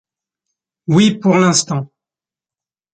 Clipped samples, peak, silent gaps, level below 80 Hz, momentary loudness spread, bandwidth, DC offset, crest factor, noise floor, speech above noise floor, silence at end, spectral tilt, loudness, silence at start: under 0.1%; -2 dBFS; none; -58 dBFS; 16 LU; 9.4 kHz; under 0.1%; 16 dB; under -90 dBFS; over 77 dB; 1.1 s; -4.5 dB/octave; -14 LUFS; 0.9 s